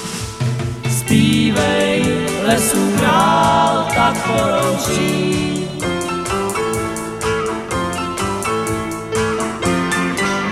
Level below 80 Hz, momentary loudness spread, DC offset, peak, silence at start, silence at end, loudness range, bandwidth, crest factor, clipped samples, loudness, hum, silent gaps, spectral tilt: -38 dBFS; 8 LU; under 0.1%; 0 dBFS; 0 s; 0 s; 6 LU; 16 kHz; 16 dB; under 0.1%; -17 LUFS; none; none; -4.5 dB/octave